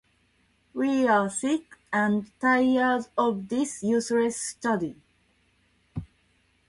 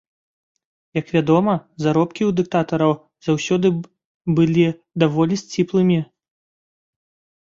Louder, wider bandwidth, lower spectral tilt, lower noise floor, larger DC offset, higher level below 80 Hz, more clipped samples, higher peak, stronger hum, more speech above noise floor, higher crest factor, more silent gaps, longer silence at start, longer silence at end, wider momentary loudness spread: second, -26 LUFS vs -19 LUFS; first, 11.5 kHz vs 7.6 kHz; second, -4.5 dB/octave vs -7 dB/octave; second, -67 dBFS vs under -90 dBFS; neither; about the same, -60 dBFS vs -58 dBFS; neither; second, -10 dBFS vs -2 dBFS; neither; second, 42 dB vs over 72 dB; about the same, 18 dB vs 18 dB; second, none vs 4.05-4.20 s; second, 0.75 s vs 0.95 s; second, 0.65 s vs 1.45 s; first, 14 LU vs 8 LU